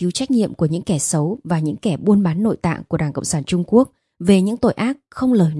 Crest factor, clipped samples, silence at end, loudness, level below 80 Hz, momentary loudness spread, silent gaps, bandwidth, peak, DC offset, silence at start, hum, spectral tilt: 16 dB; under 0.1%; 0 s; -19 LUFS; -50 dBFS; 7 LU; none; 12 kHz; -2 dBFS; under 0.1%; 0 s; none; -6 dB/octave